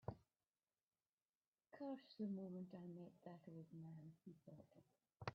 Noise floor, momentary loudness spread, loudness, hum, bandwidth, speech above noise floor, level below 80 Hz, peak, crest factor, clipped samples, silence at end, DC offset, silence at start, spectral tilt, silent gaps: under -90 dBFS; 15 LU; -56 LUFS; none; 5.8 kHz; over 34 dB; -82 dBFS; -32 dBFS; 26 dB; under 0.1%; 0 s; under 0.1%; 0.05 s; -7 dB/octave; 0.83-0.87 s, 1.09-1.17 s, 1.29-1.41 s, 1.47-1.53 s